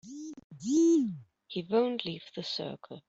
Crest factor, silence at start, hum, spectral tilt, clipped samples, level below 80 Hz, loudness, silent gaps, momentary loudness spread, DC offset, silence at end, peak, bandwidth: 16 dB; 0.05 s; none; -5 dB/octave; under 0.1%; -76 dBFS; -30 LUFS; 0.44-0.50 s; 19 LU; under 0.1%; 0.1 s; -14 dBFS; 8 kHz